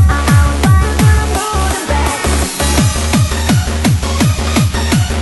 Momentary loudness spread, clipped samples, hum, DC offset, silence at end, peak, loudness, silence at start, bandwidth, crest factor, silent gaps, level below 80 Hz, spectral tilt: 4 LU; under 0.1%; none; under 0.1%; 0 s; 0 dBFS; -13 LUFS; 0 s; 12.5 kHz; 12 dB; none; -16 dBFS; -5 dB/octave